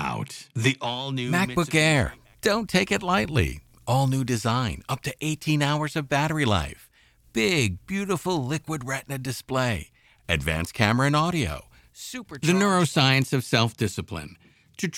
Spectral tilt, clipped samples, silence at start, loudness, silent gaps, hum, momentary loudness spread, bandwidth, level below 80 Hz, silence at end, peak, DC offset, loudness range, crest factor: -5 dB/octave; under 0.1%; 0 s; -24 LUFS; none; none; 13 LU; 16.5 kHz; -46 dBFS; 0 s; -4 dBFS; under 0.1%; 4 LU; 22 dB